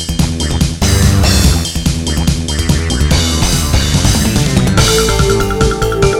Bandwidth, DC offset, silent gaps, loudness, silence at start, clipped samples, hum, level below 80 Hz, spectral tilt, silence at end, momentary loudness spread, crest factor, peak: 17 kHz; under 0.1%; none; -12 LUFS; 0 s; under 0.1%; none; -18 dBFS; -4.5 dB/octave; 0 s; 5 LU; 12 dB; 0 dBFS